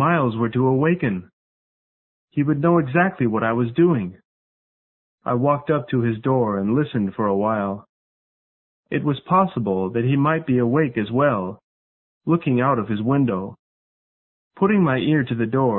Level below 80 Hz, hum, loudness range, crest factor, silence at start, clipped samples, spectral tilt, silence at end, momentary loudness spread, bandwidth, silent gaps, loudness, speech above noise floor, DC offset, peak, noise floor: -56 dBFS; none; 2 LU; 18 dB; 0 s; under 0.1%; -12.5 dB/octave; 0 s; 7 LU; 4.1 kHz; 1.33-2.28 s, 4.25-5.18 s, 7.89-8.83 s, 11.63-12.21 s, 13.59-14.51 s; -21 LUFS; over 70 dB; under 0.1%; -4 dBFS; under -90 dBFS